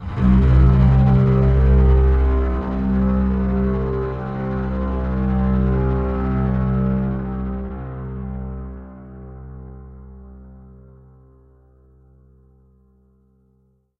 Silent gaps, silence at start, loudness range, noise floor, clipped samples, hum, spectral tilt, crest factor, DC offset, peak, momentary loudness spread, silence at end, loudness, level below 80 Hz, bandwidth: none; 0 s; 20 LU; -61 dBFS; under 0.1%; none; -11 dB/octave; 16 dB; under 0.1%; -2 dBFS; 23 LU; 3.45 s; -19 LUFS; -22 dBFS; 4.1 kHz